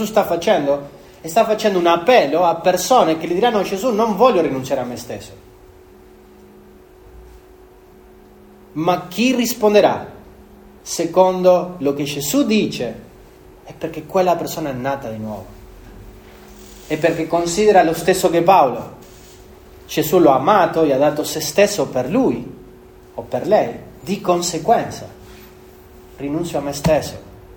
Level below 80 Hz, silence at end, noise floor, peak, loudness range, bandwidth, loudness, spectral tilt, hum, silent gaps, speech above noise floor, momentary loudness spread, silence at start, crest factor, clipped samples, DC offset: -48 dBFS; 0.05 s; -45 dBFS; 0 dBFS; 8 LU; over 20 kHz; -17 LUFS; -4.5 dB/octave; none; none; 28 dB; 17 LU; 0 s; 18 dB; under 0.1%; under 0.1%